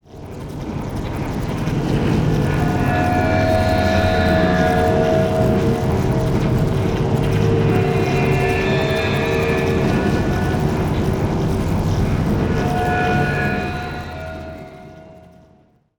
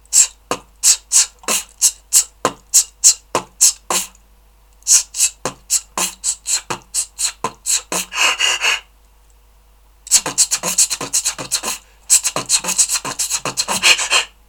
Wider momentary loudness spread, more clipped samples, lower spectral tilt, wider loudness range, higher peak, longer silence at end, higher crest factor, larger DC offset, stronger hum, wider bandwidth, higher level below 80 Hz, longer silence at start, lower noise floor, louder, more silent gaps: about the same, 11 LU vs 10 LU; neither; first, -7 dB/octave vs 1 dB/octave; about the same, 4 LU vs 4 LU; second, -4 dBFS vs 0 dBFS; first, 0.8 s vs 0.2 s; about the same, 14 dB vs 18 dB; neither; neither; about the same, over 20 kHz vs over 20 kHz; first, -30 dBFS vs -50 dBFS; about the same, 0.1 s vs 0.1 s; first, -54 dBFS vs -49 dBFS; second, -18 LUFS vs -15 LUFS; neither